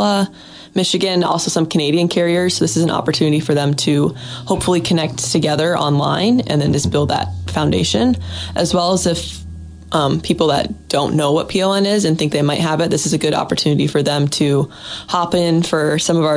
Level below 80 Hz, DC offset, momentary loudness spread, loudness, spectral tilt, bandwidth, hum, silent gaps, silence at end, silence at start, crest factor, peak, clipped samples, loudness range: -42 dBFS; under 0.1%; 6 LU; -16 LUFS; -5 dB/octave; 10.5 kHz; none; none; 0 s; 0 s; 14 dB; -2 dBFS; under 0.1%; 2 LU